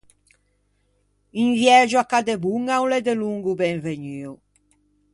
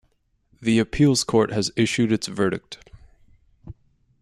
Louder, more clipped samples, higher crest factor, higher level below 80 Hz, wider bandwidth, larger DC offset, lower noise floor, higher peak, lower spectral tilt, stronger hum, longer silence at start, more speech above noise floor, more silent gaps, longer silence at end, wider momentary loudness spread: about the same, -20 LUFS vs -22 LUFS; neither; about the same, 20 dB vs 18 dB; second, -64 dBFS vs -48 dBFS; second, 11.5 kHz vs 13 kHz; neither; about the same, -66 dBFS vs -66 dBFS; first, -2 dBFS vs -6 dBFS; about the same, -4.5 dB/octave vs -5 dB/octave; first, 50 Hz at -55 dBFS vs none; first, 1.35 s vs 0.6 s; about the same, 46 dB vs 45 dB; neither; first, 0.8 s vs 0.5 s; first, 18 LU vs 13 LU